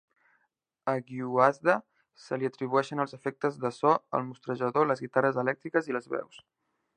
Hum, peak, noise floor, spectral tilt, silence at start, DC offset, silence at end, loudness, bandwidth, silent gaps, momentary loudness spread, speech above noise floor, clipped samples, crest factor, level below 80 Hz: none; -6 dBFS; -77 dBFS; -7 dB/octave; 0.85 s; under 0.1%; 0.6 s; -29 LUFS; 9.6 kHz; none; 10 LU; 48 dB; under 0.1%; 24 dB; -78 dBFS